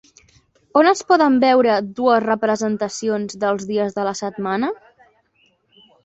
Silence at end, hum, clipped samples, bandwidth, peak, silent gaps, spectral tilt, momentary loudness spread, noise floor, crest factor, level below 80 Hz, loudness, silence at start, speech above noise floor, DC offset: 1.3 s; none; under 0.1%; 8.2 kHz; -2 dBFS; none; -4.5 dB/octave; 9 LU; -62 dBFS; 18 dB; -64 dBFS; -18 LUFS; 0.75 s; 44 dB; under 0.1%